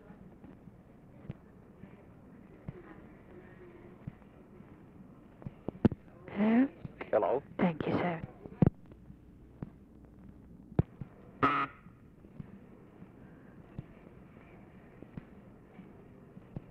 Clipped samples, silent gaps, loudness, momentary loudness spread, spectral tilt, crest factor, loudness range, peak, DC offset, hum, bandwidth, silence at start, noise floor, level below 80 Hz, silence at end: under 0.1%; none; -33 LUFS; 25 LU; -9.5 dB/octave; 24 dB; 20 LU; -14 dBFS; under 0.1%; none; 5.6 kHz; 0.2 s; -56 dBFS; -56 dBFS; 0.1 s